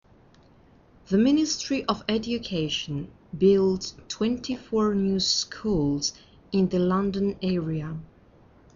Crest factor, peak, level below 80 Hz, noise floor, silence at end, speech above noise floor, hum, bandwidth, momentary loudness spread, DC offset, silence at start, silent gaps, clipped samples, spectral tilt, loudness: 18 dB; -8 dBFS; -50 dBFS; -56 dBFS; 0.7 s; 31 dB; none; 7.4 kHz; 10 LU; under 0.1%; 1.1 s; none; under 0.1%; -5.5 dB/octave; -25 LUFS